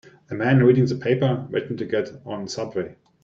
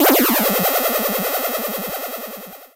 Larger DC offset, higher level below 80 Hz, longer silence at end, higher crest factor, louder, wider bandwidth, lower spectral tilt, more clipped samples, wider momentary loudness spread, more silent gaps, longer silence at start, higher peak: neither; about the same, -60 dBFS vs -58 dBFS; first, 0.3 s vs 0.1 s; about the same, 16 dB vs 20 dB; second, -22 LUFS vs -18 LUFS; second, 7.6 kHz vs 16.5 kHz; first, -7.5 dB/octave vs -3 dB/octave; neither; about the same, 15 LU vs 15 LU; neither; first, 0.3 s vs 0 s; second, -6 dBFS vs 0 dBFS